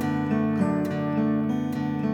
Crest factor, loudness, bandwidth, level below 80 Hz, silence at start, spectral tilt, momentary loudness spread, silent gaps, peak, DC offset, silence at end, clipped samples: 14 dB; -25 LUFS; 12.5 kHz; -62 dBFS; 0 s; -8.5 dB/octave; 3 LU; none; -12 dBFS; under 0.1%; 0 s; under 0.1%